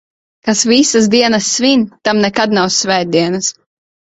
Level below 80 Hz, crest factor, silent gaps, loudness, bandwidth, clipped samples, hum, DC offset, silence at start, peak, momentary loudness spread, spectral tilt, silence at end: -52 dBFS; 14 dB; none; -12 LUFS; 8.4 kHz; under 0.1%; none; under 0.1%; 0.45 s; 0 dBFS; 6 LU; -3 dB/octave; 0.65 s